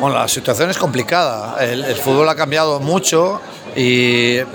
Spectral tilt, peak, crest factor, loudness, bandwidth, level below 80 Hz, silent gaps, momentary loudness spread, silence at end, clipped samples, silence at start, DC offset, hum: -4 dB/octave; 0 dBFS; 14 dB; -15 LUFS; over 20 kHz; -58 dBFS; none; 6 LU; 0 s; under 0.1%; 0 s; under 0.1%; none